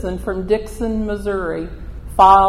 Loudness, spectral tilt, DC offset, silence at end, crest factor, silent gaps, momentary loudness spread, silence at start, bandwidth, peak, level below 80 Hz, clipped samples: -19 LUFS; -6.5 dB/octave; under 0.1%; 0 s; 16 dB; none; 14 LU; 0 s; 14.5 kHz; 0 dBFS; -32 dBFS; under 0.1%